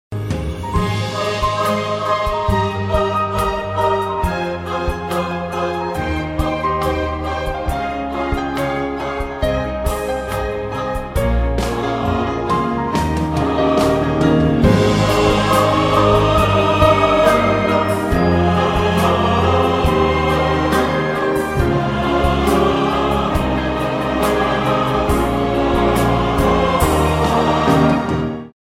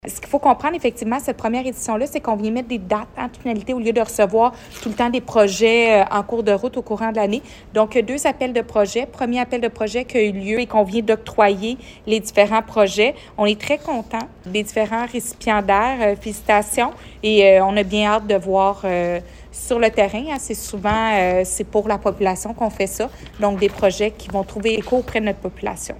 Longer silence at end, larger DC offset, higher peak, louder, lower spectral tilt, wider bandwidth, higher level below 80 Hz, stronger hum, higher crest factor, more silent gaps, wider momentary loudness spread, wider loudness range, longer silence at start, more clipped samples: about the same, 0.1 s vs 0 s; neither; about the same, 0 dBFS vs -2 dBFS; about the same, -17 LUFS vs -19 LUFS; first, -6 dB/octave vs -4 dB/octave; about the same, 16 kHz vs 16 kHz; first, -28 dBFS vs -42 dBFS; neither; about the same, 16 dB vs 18 dB; neither; about the same, 8 LU vs 9 LU; first, 7 LU vs 4 LU; about the same, 0.1 s vs 0.05 s; neither